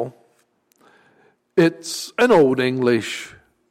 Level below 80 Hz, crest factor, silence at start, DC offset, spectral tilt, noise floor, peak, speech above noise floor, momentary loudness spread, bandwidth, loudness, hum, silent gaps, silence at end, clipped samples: -60 dBFS; 16 dB; 0 s; under 0.1%; -5 dB/octave; -63 dBFS; -6 dBFS; 45 dB; 16 LU; 16 kHz; -18 LUFS; none; none; 0.4 s; under 0.1%